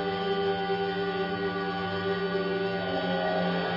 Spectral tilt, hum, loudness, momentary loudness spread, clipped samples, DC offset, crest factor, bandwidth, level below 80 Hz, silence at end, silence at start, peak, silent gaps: -7.5 dB/octave; none; -29 LUFS; 2 LU; under 0.1%; under 0.1%; 12 dB; 5.8 kHz; -62 dBFS; 0 s; 0 s; -16 dBFS; none